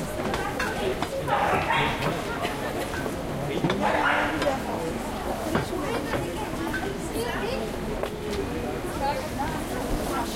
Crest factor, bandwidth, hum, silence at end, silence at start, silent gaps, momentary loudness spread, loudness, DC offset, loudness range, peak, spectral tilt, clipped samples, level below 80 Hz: 18 dB; 16 kHz; none; 0 s; 0 s; none; 7 LU; -28 LUFS; under 0.1%; 4 LU; -10 dBFS; -5 dB/octave; under 0.1%; -40 dBFS